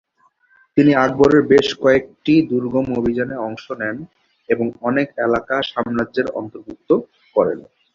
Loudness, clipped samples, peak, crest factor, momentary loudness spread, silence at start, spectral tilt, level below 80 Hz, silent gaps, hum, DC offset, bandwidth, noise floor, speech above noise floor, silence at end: -18 LUFS; under 0.1%; -2 dBFS; 16 dB; 12 LU; 0.75 s; -6.5 dB/octave; -50 dBFS; none; none; under 0.1%; 7.4 kHz; -59 dBFS; 41 dB; 0.35 s